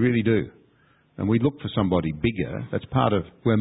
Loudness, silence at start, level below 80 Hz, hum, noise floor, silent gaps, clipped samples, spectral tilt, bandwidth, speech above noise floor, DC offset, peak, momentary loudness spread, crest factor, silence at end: -24 LUFS; 0 s; -44 dBFS; none; -60 dBFS; none; under 0.1%; -12 dB/octave; 4 kHz; 38 dB; under 0.1%; -6 dBFS; 8 LU; 18 dB; 0 s